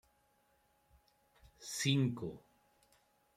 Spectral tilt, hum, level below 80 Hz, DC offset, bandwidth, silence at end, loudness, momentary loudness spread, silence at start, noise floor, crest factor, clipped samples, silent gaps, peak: -4.5 dB/octave; none; -72 dBFS; under 0.1%; 15.5 kHz; 1 s; -36 LUFS; 15 LU; 1.45 s; -75 dBFS; 22 dB; under 0.1%; none; -20 dBFS